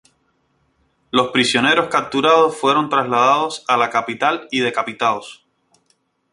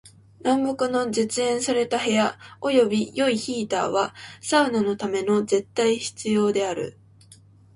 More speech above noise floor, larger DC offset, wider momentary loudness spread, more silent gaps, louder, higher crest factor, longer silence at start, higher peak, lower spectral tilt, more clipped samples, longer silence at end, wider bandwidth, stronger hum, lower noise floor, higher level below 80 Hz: first, 47 dB vs 29 dB; neither; about the same, 6 LU vs 6 LU; neither; first, -17 LUFS vs -23 LUFS; about the same, 18 dB vs 16 dB; first, 1.15 s vs 0.05 s; first, -2 dBFS vs -6 dBFS; about the same, -3.5 dB/octave vs -4 dB/octave; neither; first, 1 s vs 0.85 s; about the same, 11.5 kHz vs 11.5 kHz; neither; first, -64 dBFS vs -51 dBFS; about the same, -60 dBFS vs -64 dBFS